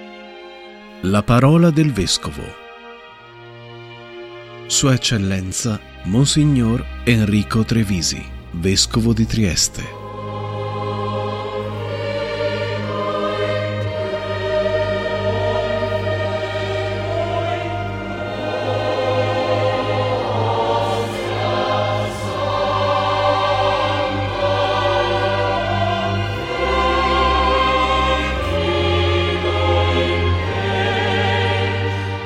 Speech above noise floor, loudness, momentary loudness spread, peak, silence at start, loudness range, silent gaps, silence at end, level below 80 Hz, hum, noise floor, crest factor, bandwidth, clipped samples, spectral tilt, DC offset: 23 dB; -19 LUFS; 13 LU; -2 dBFS; 0 s; 5 LU; none; 0 s; -34 dBFS; none; -40 dBFS; 18 dB; 14 kHz; under 0.1%; -5 dB/octave; under 0.1%